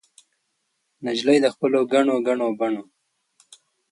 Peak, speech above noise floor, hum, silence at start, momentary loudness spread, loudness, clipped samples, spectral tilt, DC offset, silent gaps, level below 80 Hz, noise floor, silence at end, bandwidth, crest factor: -6 dBFS; 53 dB; none; 1 s; 9 LU; -21 LUFS; under 0.1%; -5 dB/octave; under 0.1%; none; -74 dBFS; -74 dBFS; 1.1 s; 11 kHz; 18 dB